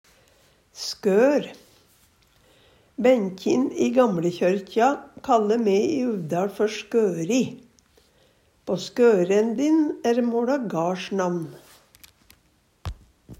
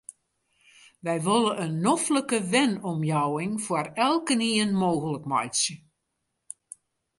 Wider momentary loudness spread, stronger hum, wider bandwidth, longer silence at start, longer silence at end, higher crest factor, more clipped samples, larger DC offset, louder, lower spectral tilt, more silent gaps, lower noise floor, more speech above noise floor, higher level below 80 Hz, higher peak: about the same, 12 LU vs 11 LU; neither; first, 16 kHz vs 11.5 kHz; first, 0.75 s vs 0.1 s; second, 0.05 s vs 1.4 s; about the same, 18 dB vs 18 dB; neither; neither; about the same, -23 LUFS vs -25 LUFS; first, -6 dB/octave vs -4 dB/octave; neither; second, -63 dBFS vs -79 dBFS; second, 42 dB vs 54 dB; first, -56 dBFS vs -70 dBFS; about the same, -6 dBFS vs -8 dBFS